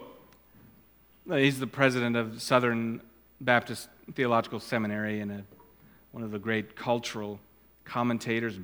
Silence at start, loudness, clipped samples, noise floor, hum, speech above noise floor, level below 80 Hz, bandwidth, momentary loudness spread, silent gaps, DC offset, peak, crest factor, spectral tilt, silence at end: 0 s; -29 LUFS; under 0.1%; -60 dBFS; none; 31 dB; -68 dBFS; 19 kHz; 15 LU; none; under 0.1%; -6 dBFS; 26 dB; -5.5 dB/octave; 0 s